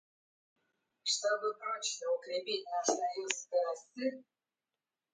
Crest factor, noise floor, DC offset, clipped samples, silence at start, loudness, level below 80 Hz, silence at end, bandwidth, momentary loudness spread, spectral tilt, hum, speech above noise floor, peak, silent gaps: 28 dB; under -90 dBFS; under 0.1%; under 0.1%; 1.05 s; -35 LUFS; under -90 dBFS; 0.9 s; 9.6 kHz; 6 LU; 0 dB/octave; none; over 54 dB; -10 dBFS; none